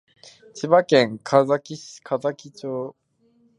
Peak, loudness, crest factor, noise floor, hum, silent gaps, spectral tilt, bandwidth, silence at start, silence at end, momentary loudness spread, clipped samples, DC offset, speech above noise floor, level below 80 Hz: -2 dBFS; -21 LUFS; 22 dB; -62 dBFS; none; none; -5.5 dB/octave; 10.5 kHz; 0.55 s; 0.7 s; 19 LU; under 0.1%; under 0.1%; 40 dB; -74 dBFS